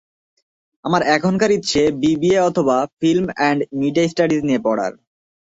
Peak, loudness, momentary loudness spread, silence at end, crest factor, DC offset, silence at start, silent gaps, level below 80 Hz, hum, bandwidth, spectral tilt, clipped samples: -2 dBFS; -18 LUFS; 5 LU; 0.6 s; 16 dB; under 0.1%; 0.85 s; 2.93-2.97 s; -52 dBFS; none; 8 kHz; -5.5 dB/octave; under 0.1%